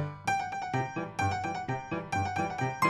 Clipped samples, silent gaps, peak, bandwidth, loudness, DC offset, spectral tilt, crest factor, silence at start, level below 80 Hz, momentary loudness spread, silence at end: under 0.1%; none; -14 dBFS; 15 kHz; -33 LUFS; under 0.1%; -5.5 dB/octave; 18 dB; 0 s; -62 dBFS; 4 LU; 0 s